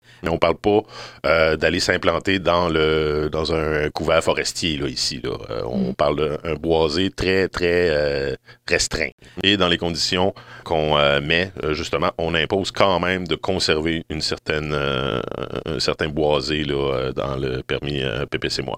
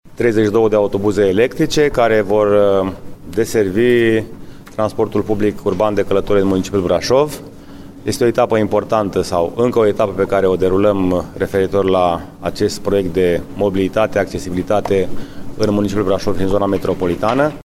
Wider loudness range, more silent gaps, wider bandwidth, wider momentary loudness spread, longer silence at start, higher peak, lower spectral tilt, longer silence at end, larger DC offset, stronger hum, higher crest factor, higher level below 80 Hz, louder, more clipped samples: about the same, 3 LU vs 3 LU; first, 9.12-9.18 s vs none; about the same, 15.5 kHz vs 16 kHz; about the same, 7 LU vs 7 LU; first, 0.2 s vs 0.05 s; about the same, 0 dBFS vs 0 dBFS; second, -4.5 dB/octave vs -6 dB/octave; about the same, 0 s vs 0.05 s; first, 0.2% vs under 0.1%; neither; first, 20 dB vs 14 dB; about the same, -40 dBFS vs -38 dBFS; second, -21 LUFS vs -16 LUFS; neither